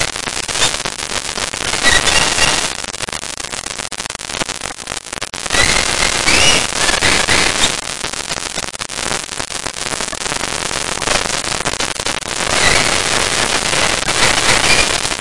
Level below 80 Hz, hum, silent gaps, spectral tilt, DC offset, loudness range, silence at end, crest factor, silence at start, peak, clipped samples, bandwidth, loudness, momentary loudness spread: -34 dBFS; none; none; -1 dB/octave; 2%; 6 LU; 0 s; 16 dB; 0 s; 0 dBFS; 0.6%; 12 kHz; -14 LUFS; 11 LU